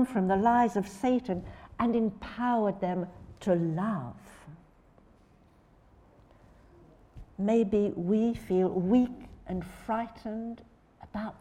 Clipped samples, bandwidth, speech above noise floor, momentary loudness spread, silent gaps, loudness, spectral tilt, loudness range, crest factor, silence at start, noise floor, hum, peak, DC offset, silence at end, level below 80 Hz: under 0.1%; 12 kHz; 32 dB; 16 LU; none; -29 LUFS; -8 dB/octave; 7 LU; 18 dB; 0 s; -61 dBFS; none; -14 dBFS; under 0.1%; 0.05 s; -56 dBFS